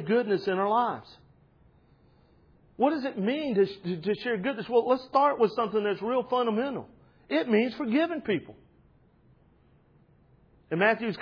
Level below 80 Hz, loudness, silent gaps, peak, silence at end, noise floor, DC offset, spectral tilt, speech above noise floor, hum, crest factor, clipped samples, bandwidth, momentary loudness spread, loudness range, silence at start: -68 dBFS; -27 LUFS; none; -10 dBFS; 0 s; -62 dBFS; under 0.1%; -8 dB/octave; 35 dB; none; 18 dB; under 0.1%; 5.4 kHz; 7 LU; 5 LU; 0 s